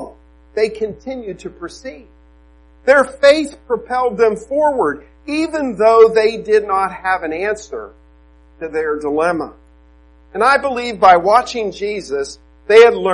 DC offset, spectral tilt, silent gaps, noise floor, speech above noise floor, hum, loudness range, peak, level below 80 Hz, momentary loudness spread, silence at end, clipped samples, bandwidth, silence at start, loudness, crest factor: under 0.1%; -4 dB/octave; none; -47 dBFS; 32 dB; none; 6 LU; 0 dBFS; -46 dBFS; 20 LU; 0 s; under 0.1%; 11 kHz; 0 s; -15 LUFS; 16 dB